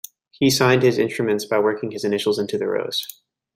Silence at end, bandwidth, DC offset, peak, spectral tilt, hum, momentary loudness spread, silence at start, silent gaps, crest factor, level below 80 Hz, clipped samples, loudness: 0.45 s; 16 kHz; under 0.1%; -4 dBFS; -4.5 dB/octave; none; 10 LU; 0.4 s; none; 18 dB; -62 dBFS; under 0.1%; -20 LUFS